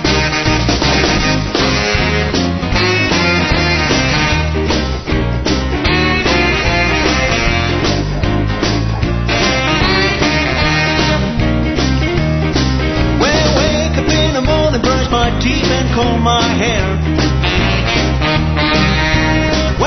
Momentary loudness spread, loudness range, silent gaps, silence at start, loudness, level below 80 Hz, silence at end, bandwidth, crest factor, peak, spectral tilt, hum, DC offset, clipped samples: 4 LU; 1 LU; none; 0 s; -13 LUFS; -20 dBFS; 0 s; 6.4 kHz; 14 dB; 0 dBFS; -5 dB/octave; none; under 0.1%; under 0.1%